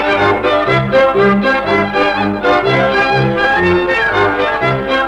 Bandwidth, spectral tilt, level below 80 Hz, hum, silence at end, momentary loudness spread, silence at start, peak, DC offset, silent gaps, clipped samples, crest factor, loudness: 10.5 kHz; -6.5 dB/octave; -38 dBFS; none; 0 s; 3 LU; 0 s; -2 dBFS; under 0.1%; none; under 0.1%; 12 dB; -12 LUFS